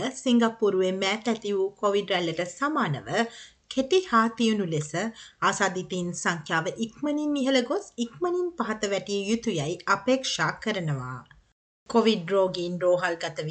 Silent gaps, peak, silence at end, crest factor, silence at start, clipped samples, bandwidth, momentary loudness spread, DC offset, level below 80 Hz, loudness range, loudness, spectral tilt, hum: 11.52-11.86 s; -8 dBFS; 0 s; 18 dB; 0 s; under 0.1%; 9.2 kHz; 8 LU; under 0.1%; -64 dBFS; 2 LU; -26 LUFS; -4.5 dB/octave; none